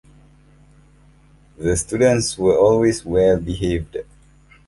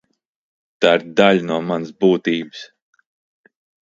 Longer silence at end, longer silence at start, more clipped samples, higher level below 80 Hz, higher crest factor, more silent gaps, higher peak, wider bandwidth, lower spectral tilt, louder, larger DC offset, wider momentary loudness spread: second, 0.65 s vs 1.2 s; first, 1.6 s vs 0.8 s; neither; first, -38 dBFS vs -64 dBFS; about the same, 18 dB vs 20 dB; neither; about the same, -2 dBFS vs 0 dBFS; first, 11.5 kHz vs 7.8 kHz; about the same, -5.5 dB/octave vs -6 dB/octave; about the same, -18 LUFS vs -17 LUFS; neither; about the same, 11 LU vs 10 LU